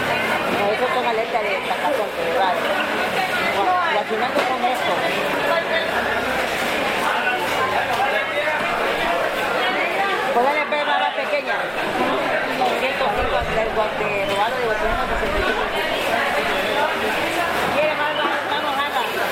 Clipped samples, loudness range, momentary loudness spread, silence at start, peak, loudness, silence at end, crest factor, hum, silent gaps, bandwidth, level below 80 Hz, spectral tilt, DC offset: under 0.1%; 1 LU; 2 LU; 0 s; -6 dBFS; -20 LUFS; 0 s; 14 dB; none; none; 16.5 kHz; -42 dBFS; -3.5 dB/octave; under 0.1%